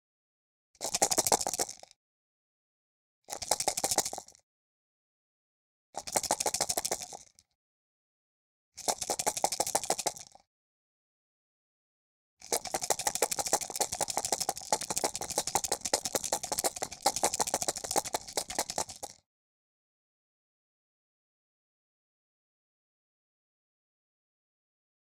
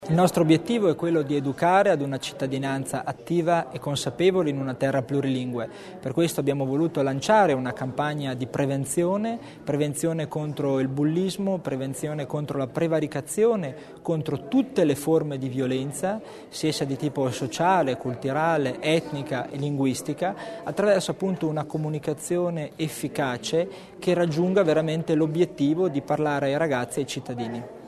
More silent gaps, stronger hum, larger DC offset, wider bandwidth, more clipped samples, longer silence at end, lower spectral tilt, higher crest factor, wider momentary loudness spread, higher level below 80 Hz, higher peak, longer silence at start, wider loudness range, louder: first, 1.96-3.22 s, 4.43-5.93 s, 7.55-8.72 s, 10.47-12.37 s vs none; neither; neither; first, 18 kHz vs 13.5 kHz; neither; first, 6 s vs 0 s; second, -0.5 dB/octave vs -6 dB/octave; first, 32 dB vs 18 dB; about the same, 10 LU vs 9 LU; about the same, -66 dBFS vs -62 dBFS; about the same, -4 dBFS vs -6 dBFS; first, 0.8 s vs 0 s; first, 6 LU vs 3 LU; second, -31 LUFS vs -25 LUFS